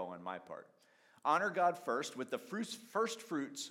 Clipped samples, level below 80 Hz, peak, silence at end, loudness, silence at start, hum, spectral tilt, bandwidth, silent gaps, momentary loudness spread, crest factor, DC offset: under 0.1%; under -90 dBFS; -18 dBFS; 0 s; -38 LUFS; 0 s; none; -3.5 dB/octave; 16.5 kHz; none; 12 LU; 20 dB; under 0.1%